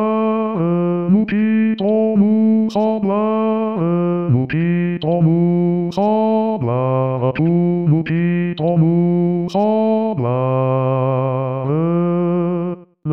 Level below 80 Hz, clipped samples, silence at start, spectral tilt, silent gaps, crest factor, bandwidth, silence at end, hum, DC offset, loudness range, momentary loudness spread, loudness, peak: -56 dBFS; under 0.1%; 0 s; -10 dB/octave; none; 12 dB; 6 kHz; 0 s; none; 0.3%; 1 LU; 4 LU; -17 LUFS; -4 dBFS